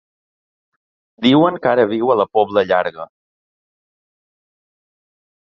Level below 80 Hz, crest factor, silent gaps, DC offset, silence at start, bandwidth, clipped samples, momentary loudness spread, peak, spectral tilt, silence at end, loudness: -60 dBFS; 18 dB; none; under 0.1%; 1.2 s; 7 kHz; under 0.1%; 12 LU; 0 dBFS; -7.5 dB/octave; 2.5 s; -16 LUFS